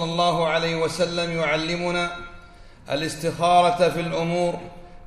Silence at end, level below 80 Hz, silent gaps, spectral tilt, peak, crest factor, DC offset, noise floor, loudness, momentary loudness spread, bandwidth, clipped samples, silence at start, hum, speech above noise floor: 0 s; -46 dBFS; none; -4.5 dB/octave; -6 dBFS; 18 dB; under 0.1%; -45 dBFS; -22 LUFS; 11 LU; 14 kHz; under 0.1%; 0 s; none; 23 dB